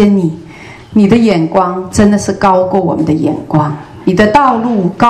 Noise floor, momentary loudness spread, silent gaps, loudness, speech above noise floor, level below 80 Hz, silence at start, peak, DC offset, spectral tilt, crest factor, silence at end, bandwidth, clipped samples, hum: -32 dBFS; 10 LU; none; -11 LUFS; 22 dB; -40 dBFS; 0 s; 0 dBFS; under 0.1%; -6.5 dB/octave; 10 dB; 0 s; 12 kHz; 0.6%; none